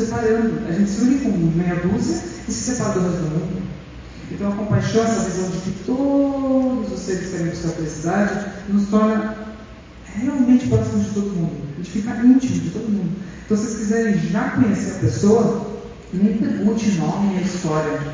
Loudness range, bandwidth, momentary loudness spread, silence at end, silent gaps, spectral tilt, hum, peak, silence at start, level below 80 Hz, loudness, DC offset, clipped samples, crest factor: 3 LU; 7.6 kHz; 11 LU; 0 s; none; -6.5 dB/octave; none; -4 dBFS; 0 s; -42 dBFS; -20 LUFS; under 0.1%; under 0.1%; 16 dB